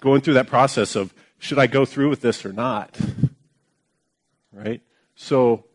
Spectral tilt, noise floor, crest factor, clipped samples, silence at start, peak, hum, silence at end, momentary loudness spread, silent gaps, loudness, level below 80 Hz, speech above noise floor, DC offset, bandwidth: -6 dB/octave; -73 dBFS; 20 dB; under 0.1%; 0 s; -2 dBFS; none; 0.15 s; 15 LU; none; -21 LUFS; -56 dBFS; 53 dB; under 0.1%; 11 kHz